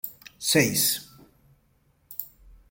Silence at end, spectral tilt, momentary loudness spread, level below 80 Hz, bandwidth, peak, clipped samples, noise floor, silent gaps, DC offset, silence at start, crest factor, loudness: 0.45 s; -2.5 dB/octave; 17 LU; -60 dBFS; 17 kHz; -6 dBFS; under 0.1%; -65 dBFS; none; under 0.1%; 0.05 s; 22 dB; -23 LUFS